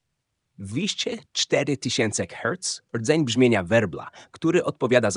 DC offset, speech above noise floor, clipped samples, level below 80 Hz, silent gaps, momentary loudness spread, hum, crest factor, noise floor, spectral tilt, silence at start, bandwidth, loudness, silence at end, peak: under 0.1%; 54 dB; under 0.1%; -62 dBFS; none; 10 LU; none; 20 dB; -78 dBFS; -4 dB/octave; 0.6 s; 11 kHz; -24 LUFS; 0 s; -4 dBFS